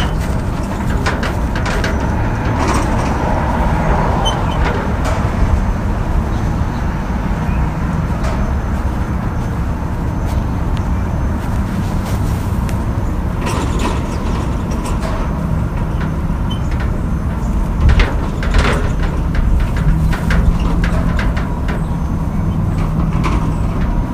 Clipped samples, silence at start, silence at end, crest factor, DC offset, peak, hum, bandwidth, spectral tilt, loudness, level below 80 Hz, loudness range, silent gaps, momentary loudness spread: under 0.1%; 0 s; 0 s; 16 dB; under 0.1%; 0 dBFS; none; 15 kHz; -6.5 dB/octave; -18 LUFS; -18 dBFS; 3 LU; none; 4 LU